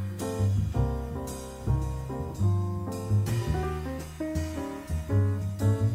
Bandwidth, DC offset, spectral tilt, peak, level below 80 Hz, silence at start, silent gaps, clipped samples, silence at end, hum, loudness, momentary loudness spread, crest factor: 15.5 kHz; under 0.1%; -7.5 dB/octave; -14 dBFS; -38 dBFS; 0 s; none; under 0.1%; 0 s; none; -30 LUFS; 8 LU; 14 dB